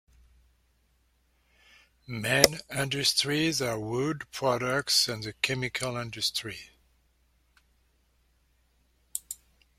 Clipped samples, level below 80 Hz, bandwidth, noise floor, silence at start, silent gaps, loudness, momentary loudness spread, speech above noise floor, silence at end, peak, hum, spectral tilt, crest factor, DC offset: under 0.1%; -60 dBFS; 16.5 kHz; -69 dBFS; 2.1 s; none; -27 LUFS; 16 LU; 40 dB; 0.45 s; 0 dBFS; none; -3 dB/octave; 32 dB; under 0.1%